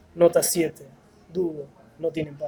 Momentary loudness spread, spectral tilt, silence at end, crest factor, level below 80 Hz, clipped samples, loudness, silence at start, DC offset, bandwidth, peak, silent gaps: 17 LU; -4.5 dB/octave; 0 s; 20 dB; -60 dBFS; under 0.1%; -24 LUFS; 0.15 s; under 0.1%; over 20 kHz; -6 dBFS; none